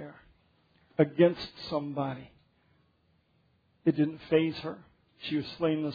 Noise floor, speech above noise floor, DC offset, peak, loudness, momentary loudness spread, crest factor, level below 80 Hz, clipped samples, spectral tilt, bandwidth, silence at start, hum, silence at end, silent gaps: -70 dBFS; 41 dB; under 0.1%; -10 dBFS; -30 LUFS; 16 LU; 22 dB; -66 dBFS; under 0.1%; -6 dB/octave; 5 kHz; 0 s; none; 0 s; none